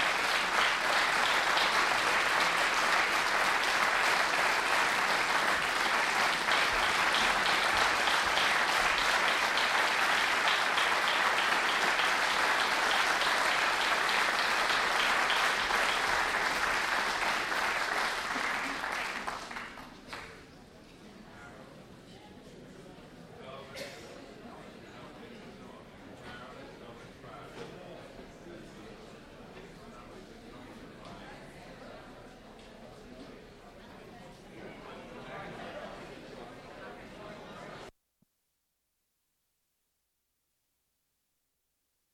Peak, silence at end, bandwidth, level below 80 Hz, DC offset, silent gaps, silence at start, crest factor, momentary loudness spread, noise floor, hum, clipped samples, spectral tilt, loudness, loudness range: -14 dBFS; 4.25 s; 16.5 kHz; -60 dBFS; under 0.1%; none; 0 s; 18 dB; 23 LU; -81 dBFS; none; under 0.1%; -1 dB/octave; -27 LUFS; 22 LU